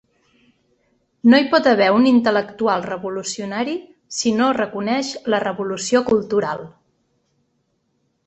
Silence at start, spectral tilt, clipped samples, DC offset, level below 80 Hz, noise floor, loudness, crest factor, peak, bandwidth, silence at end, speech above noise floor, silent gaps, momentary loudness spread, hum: 1.25 s; -4 dB/octave; under 0.1%; under 0.1%; -60 dBFS; -68 dBFS; -18 LUFS; 18 dB; -2 dBFS; 8.4 kHz; 1.6 s; 50 dB; none; 12 LU; none